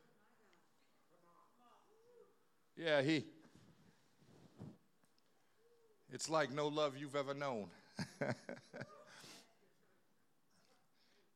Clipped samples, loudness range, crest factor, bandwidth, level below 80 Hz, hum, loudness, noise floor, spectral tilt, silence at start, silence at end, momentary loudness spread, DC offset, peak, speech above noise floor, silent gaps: under 0.1%; 9 LU; 26 dB; 14 kHz; under -90 dBFS; none; -41 LUFS; -81 dBFS; -4.5 dB/octave; 2.2 s; 1.95 s; 21 LU; under 0.1%; -22 dBFS; 40 dB; none